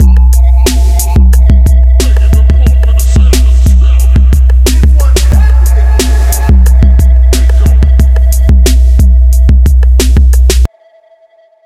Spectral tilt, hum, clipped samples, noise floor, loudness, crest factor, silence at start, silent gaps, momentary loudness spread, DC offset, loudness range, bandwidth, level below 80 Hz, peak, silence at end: -5.5 dB/octave; none; 0.3%; -44 dBFS; -7 LUFS; 4 dB; 0 s; none; 2 LU; 0.7%; 0 LU; 14 kHz; -4 dBFS; 0 dBFS; 1 s